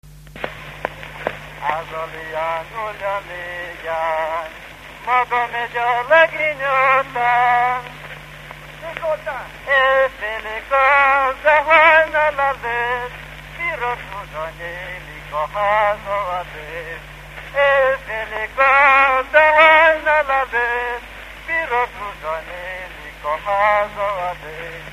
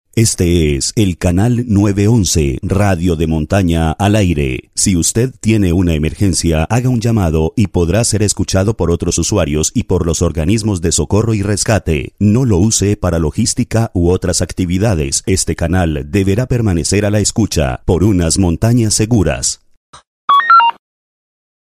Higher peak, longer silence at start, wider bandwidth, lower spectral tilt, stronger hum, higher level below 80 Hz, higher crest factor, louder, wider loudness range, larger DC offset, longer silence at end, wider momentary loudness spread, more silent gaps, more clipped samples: about the same, 0 dBFS vs 0 dBFS; about the same, 0.05 s vs 0.15 s; about the same, 15 kHz vs 15.5 kHz; second, -3.5 dB/octave vs -5 dB/octave; neither; second, -44 dBFS vs -26 dBFS; first, 18 dB vs 12 dB; second, -17 LUFS vs -13 LUFS; first, 11 LU vs 1 LU; neither; second, 0 s vs 1 s; first, 19 LU vs 4 LU; second, none vs 19.77-19.93 s, 20.07-20.28 s; neither